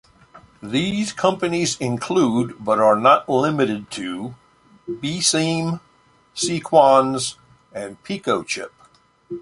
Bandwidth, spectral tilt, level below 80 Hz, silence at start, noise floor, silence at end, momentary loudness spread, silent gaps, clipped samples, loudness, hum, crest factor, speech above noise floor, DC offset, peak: 11.5 kHz; -4 dB/octave; -58 dBFS; 0.35 s; -56 dBFS; 0 s; 18 LU; none; under 0.1%; -19 LUFS; none; 20 dB; 37 dB; under 0.1%; -2 dBFS